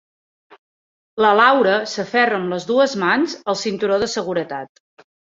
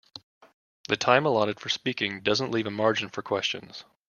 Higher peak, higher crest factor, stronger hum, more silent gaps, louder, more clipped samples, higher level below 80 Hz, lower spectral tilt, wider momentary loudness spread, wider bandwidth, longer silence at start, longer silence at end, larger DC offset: about the same, -2 dBFS vs -4 dBFS; second, 18 dB vs 24 dB; neither; second, none vs 0.23-0.41 s, 0.54-0.84 s; first, -18 LUFS vs -26 LUFS; neither; first, -62 dBFS vs -68 dBFS; about the same, -4 dB/octave vs -4 dB/octave; second, 12 LU vs 20 LU; second, 7.8 kHz vs 10 kHz; first, 1.15 s vs 0.15 s; first, 0.7 s vs 0.25 s; neither